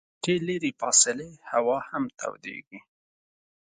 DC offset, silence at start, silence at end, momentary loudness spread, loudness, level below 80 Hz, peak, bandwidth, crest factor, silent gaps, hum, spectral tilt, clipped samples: under 0.1%; 0.25 s; 0.9 s; 18 LU; -25 LUFS; -68 dBFS; -6 dBFS; 9.6 kHz; 24 dB; 2.67-2.71 s; none; -2.5 dB/octave; under 0.1%